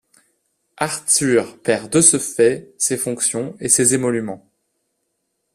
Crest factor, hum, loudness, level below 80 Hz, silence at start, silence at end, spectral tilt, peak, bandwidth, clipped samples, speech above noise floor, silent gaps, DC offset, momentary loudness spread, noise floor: 20 dB; none; -17 LUFS; -60 dBFS; 0.8 s; 1.15 s; -3 dB/octave; 0 dBFS; 15.5 kHz; under 0.1%; 55 dB; none; under 0.1%; 12 LU; -73 dBFS